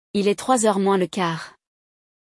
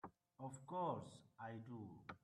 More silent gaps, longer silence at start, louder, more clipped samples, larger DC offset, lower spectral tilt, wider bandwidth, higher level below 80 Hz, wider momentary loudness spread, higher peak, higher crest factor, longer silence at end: neither; about the same, 0.15 s vs 0.05 s; first, -21 LUFS vs -50 LUFS; neither; neither; second, -4.5 dB/octave vs -6.5 dB/octave; about the same, 12 kHz vs 12 kHz; first, -66 dBFS vs -84 dBFS; about the same, 11 LU vs 12 LU; first, -6 dBFS vs -32 dBFS; about the same, 16 dB vs 20 dB; first, 0.85 s vs 0.05 s